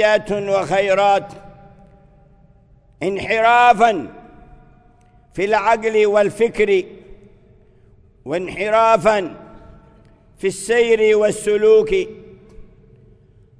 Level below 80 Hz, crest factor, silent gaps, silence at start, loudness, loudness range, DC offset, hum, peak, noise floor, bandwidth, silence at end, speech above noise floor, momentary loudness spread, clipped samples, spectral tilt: -48 dBFS; 18 dB; none; 0 s; -16 LUFS; 4 LU; under 0.1%; none; 0 dBFS; -51 dBFS; 11 kHz; 0.95 s; 35 dB; 13 LU; under 0.1%; -4.5 dB/octave